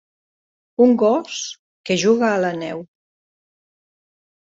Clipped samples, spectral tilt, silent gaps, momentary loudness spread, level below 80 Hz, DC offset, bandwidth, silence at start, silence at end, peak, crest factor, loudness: under 0.1%; -4.5 dB/octave; 1.59-1.84 s; 16 LU; -66 dBFS; under 0.1%; 7.8 kHz; 0.8 s; 1.55 s; -4 dBFS; 18 dB; -18 LUFS